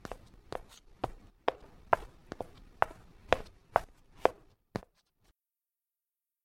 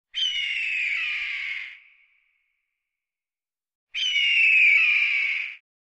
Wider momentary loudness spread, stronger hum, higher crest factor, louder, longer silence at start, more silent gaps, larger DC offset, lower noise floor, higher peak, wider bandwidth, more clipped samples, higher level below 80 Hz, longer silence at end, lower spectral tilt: about the same, 16 LU vs 17 LU; neither; first, 32 dB vs 16 dB; second, -36 LUFS vs -20 LUFS; about the same, 0.1 s vs 0.15 s; second, none vs 3.75-3.87 s; neither; about the same, under -90 dBFS vs under -90 dBFS; first, -6 dBFS vs -10 dBFS; first, 16.5 kHz vs 9 kHz; neither; first, -54 dBFS vs -70 dBFS; first, 1.65 s vs 0.3 s; first, -5 dB/octave vs 4.5 dB/octave